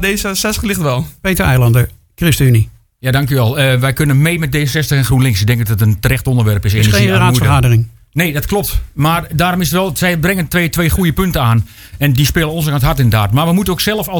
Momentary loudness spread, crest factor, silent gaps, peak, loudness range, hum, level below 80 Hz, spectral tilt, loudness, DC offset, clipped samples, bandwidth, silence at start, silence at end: 6 LU; 12 dB; none; 0 dBFS; 2 LU; none; -28 dBFS; -5.5 dB/octave; -13 LUFS; under 0.1%; under 0.1%; 19.5 kHz; 0 s; 0 s